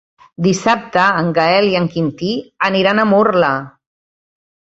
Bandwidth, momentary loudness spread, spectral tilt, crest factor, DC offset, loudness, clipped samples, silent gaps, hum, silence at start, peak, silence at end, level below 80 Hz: 8 kHz; 7 LU; -5.5 dB/octave; 16 dB; under 0.1%; -15 LUFS; under 0.1%; none; none; 0.4 s; 0 dBFS; 1 s; -54 dBFS